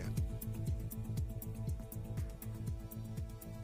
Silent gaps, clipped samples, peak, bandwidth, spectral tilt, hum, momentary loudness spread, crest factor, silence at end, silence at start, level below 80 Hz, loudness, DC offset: none; under 0.1%; -26 dBFS; 16 kHz; -7 dB/octave; none; 5 LU; 14 dB; 0 s; 0 s; -46 dBFS; -43 LUFS; under 0.1%